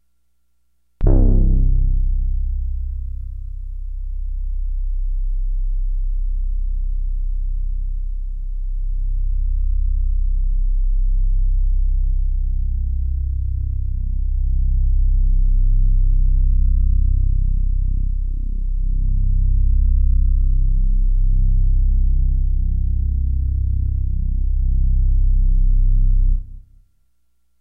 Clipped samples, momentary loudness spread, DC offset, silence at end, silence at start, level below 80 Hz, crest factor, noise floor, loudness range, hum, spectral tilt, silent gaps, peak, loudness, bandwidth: under 0.1%; 9 LU; under 0.1%; 1 s; 1 s; -16 dBFS; 14 dB; -69 dBFS; 7 LU; none; -13 dB/octave; none; -4 dBFS; -23 LUFS; 0.9 kHz